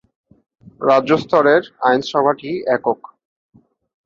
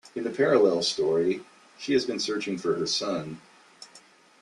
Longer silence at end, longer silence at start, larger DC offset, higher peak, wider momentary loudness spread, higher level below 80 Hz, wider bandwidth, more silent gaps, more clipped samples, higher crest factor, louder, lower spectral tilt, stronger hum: first, 1.1 s vs 0.45 s; first, 0.8 s vs 0.05 s; neither; first, -2 dBFS vs -10 dBFS; second, 9 LU vs 13 LU; first, -62 dBFS vs -68 dBFS; second, 7.6 kHz vs 11 kHz; neither; neither; about the same, 16 dB vs 18 dB; first, -17 LUFS vs -26 LUFS; first, -6 dB/octave vs -4 dB/octave; neither